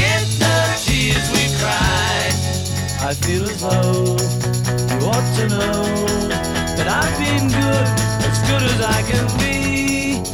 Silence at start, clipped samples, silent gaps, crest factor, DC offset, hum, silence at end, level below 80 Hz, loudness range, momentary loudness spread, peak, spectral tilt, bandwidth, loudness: 0 s; under 0.1%; none; 16 dB; under 0.1%; none; 0 s; -32 dBFS; 1 LU; 4 LU; -2 dBFS; -4.5 dB/octave; over 20 kHz; -17 LUFS